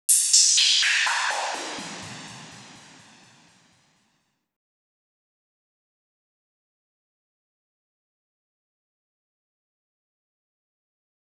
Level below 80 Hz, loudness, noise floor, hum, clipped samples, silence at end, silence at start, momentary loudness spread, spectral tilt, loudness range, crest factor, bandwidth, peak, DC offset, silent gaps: -80 dBFS; -18 LUFS; -72 dBFS; none; under 0.1%; 8.6 s; 0.1 s; 24 LU; 2 dB/octave; 24 LU; 26 dB; over 20 kHz; -2 dBFS; under 0.1%; none